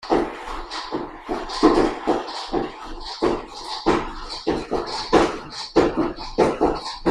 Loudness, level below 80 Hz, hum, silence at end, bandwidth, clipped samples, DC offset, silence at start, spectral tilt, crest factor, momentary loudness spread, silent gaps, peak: -23 LUFS; -38 dBFS; none; 0 s; 11 kHz; under 0.1%; under 0.1%; 0 s; -5 dB/octave; 20 dB; 12 LU; none; -2 dBFS